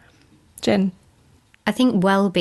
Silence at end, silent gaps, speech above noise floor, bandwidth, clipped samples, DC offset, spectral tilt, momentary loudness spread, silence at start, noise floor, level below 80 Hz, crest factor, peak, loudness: 0 s; none; 38 dB; 12 kHz; under 0.1%; under 0.1%; -6 dB/octave; 9 LU; 0.6 s; -55 dBFS; -58 dBFS; 18 dB; -4 dBFS; -20 LUFS